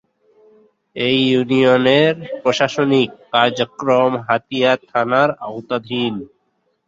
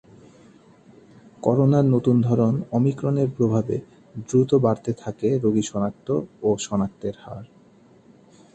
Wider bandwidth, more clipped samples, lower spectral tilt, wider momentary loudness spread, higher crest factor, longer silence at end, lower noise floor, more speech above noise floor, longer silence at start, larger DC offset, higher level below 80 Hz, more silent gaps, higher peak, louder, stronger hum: second, 7.8 kHz vs 8.6 kHz; neither; second, -5.5 dB/octave vs -8 dB/octave; second, 9 LU vs 13 LU; about the same, 16 dB vs 18 dB; second, 0.6 s vs 1.1 s; first, -67 dBFS vs -53 dBFS; first, 50 dB vs 32 dB; second, 0.95 s vs 1.4 s; neither; about the same, -60 dBFS vs -56 dBFS; neither; about the same, -2 dBFS vs -4 dBFS; first, -17 LUFS vs -22 LUFS; neither